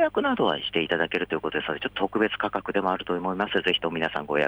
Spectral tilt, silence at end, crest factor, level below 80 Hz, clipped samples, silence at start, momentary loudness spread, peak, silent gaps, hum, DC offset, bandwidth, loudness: -6 dB/octave; 0 s; 16 dB; -58 dBFS; under 0.1%; 0 s; 5 LU; -10 dBFS; none; none; under 0.1%; over 20 kHz; -26 LUFS